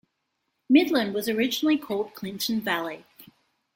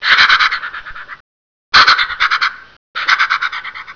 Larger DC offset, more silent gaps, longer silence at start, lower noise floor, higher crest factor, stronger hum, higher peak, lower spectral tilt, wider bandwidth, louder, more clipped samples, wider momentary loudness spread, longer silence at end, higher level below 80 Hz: second, under 0.1% vs 0.3%; second, none vs 1.20-1.72 s, 2.77-2.94 s; first, 0.7 s vs 0 s; second, -78 dBFS vs under -90 dBFS; first, 20 dB vs 14 dB; neither; second, -6 dBFS vs 0 dBFS; first, -4 dB/octave vs 0.5 dB/octave; first, 17 kHz vs 5.4 kHz; second, -25 LUFS vs -11 LUFS; neither; second, 12 LU vs 19 LU; first, 0.5 s vs 0.05 s; second, -70 dBFS vs -48 dBFS